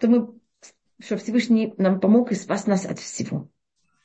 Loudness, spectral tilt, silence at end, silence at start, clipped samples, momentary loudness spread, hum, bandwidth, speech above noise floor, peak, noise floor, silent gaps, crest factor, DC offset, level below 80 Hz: -22 LUFS; -6 dB/octave; 0.6 s; 0 s; under 0.1%; 12 LU; none; 8.4 kHz; 51 dB; -8 dBFS; -72 dBFS; none; 16 dB; under 0.1%; -70 dBFS